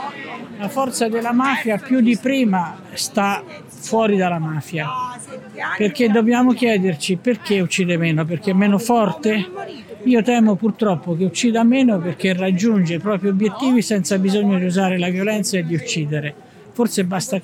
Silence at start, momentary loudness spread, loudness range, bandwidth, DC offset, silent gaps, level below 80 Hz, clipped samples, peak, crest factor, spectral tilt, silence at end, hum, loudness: 0 s; 11 LU; 3 LU; 16 kHz; under 0.1%; none; -66 dBFS; under 0.1%; -4 dBFS; 14 dB; -5.5 dB/octave; 0 s; none; -18 LUFS